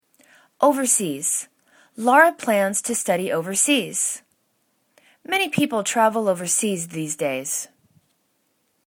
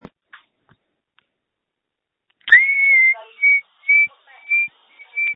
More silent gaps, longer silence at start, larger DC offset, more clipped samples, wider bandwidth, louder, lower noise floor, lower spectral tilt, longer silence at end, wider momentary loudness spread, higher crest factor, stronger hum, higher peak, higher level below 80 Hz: neither; second, 0.6 s vs 2.45 s; neither; neither; first, 19 kHz vs 4.1 kHz; second, -20 LUFS vs -14 LUFS; second, -69 dBFS vs -81 dBFS; about the same, -2.5 dB/octave vs -2 dB/octave; first, 1.2 s vs 0 s; about the same, 10 LU vs 12 LU; about the same, 22 dB vs 20 dB; neither; about the same, 0 dBFS vs 0 dBFS; second, -72 dBFS vs -66 dBFS